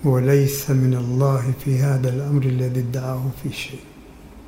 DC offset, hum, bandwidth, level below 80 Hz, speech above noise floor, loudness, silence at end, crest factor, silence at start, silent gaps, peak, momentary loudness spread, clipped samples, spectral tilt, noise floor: under 0.1%; none; 16 kHz; -48 dBFS; 22 dB; -21 LUFS; 0 s; 16 dB; 0 s; none; -4 dBFS; 11 LU; under 0.1%; -7 dB/octave; -42 dBFS